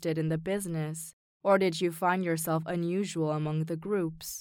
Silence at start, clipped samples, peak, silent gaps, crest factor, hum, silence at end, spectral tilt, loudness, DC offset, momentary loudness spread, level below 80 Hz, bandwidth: 0 s; under 0.1%; -12 dBFS; 1.13-1.40 s; 18 dB; none; 0 s; -5.5 dB/octave; -30 LUFS; under 0.1%; 9 LU; -64 dBFS; 18.5 kHz